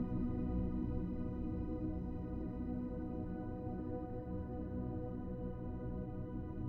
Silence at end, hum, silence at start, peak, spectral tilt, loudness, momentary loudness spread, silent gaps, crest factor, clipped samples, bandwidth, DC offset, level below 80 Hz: 0 s; none; 0 s; -26 dBFS; -12 dB/octave; -43 LUFS; 5 LU; none; 14 dB; under 0.1%; 4.2 kHz; under 0.1%; -48 dBFS